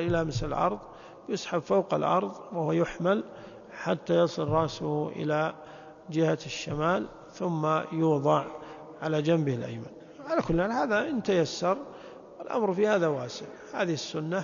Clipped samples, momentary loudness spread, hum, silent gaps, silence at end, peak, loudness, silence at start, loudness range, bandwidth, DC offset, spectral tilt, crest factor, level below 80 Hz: under 0.1%; 17 LU; none; none; 0 s; -10 dBFS; -29 LUFS; 0 s; 2 LU; 7.4 kHz; under 0.1%; -6 dB/octave; 18 dB; -54 dBFS